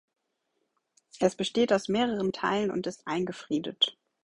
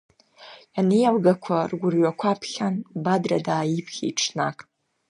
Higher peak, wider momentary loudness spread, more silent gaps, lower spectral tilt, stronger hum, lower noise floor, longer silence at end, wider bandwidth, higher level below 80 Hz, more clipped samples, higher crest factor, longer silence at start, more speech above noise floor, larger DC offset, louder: second, -10 dBFS vs -6 dBFS; about the same, 7 LU vs 8 LU; neither; about the same, -4.5 dB/octave vs -5.5 dB/octave; neither; first, -79 dBFS vs -48 dBFS; second, 0.35 s vs 0.55 s; about the same, 11.5 kHz vs 11 kHz; about the same, -66 dBFS vs -70 dBFS; neither; about the same, 20 dB vs 18 dB; first, 1.15 s vs 0.4 s; first, 50 dB vs 25 dB; neither; second, -29 LUFS vs -23 LUFS